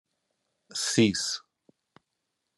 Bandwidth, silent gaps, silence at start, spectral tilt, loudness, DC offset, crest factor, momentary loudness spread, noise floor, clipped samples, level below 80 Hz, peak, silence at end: 12.5 kHz; none; 0.75 s; -3.5 dB/octave; -27 LUFS; under 0.1%; 22 dB; 13 LU; -82 dBFS; under 0.1%; -74 dBFS; -10 dBFS; 1.2 s